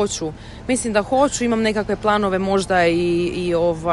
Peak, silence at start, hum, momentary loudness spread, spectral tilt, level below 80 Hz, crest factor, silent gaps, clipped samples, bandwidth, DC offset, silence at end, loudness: -2 dBFS; 0 s; none; 6 LU; -4.5 dB/octave; -42 dBFS; 16 dB; none; under 0.1%; 11.5 kHz; under 0.1%; 0 s; -19 LUFS